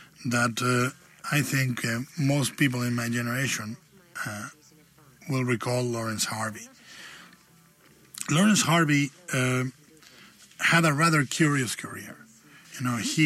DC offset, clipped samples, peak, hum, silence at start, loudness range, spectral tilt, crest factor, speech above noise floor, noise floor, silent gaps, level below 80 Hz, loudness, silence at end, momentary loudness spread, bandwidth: under 0.1%; under 0.1%; -6 dBFS; none; 0 s; 7 LU; -4.5 dB/octave; 22 dB; 32 dB; -58 dBFS; none; -66 dBFS; -26 LUFS; 0 s; 22 LU; 16 kHz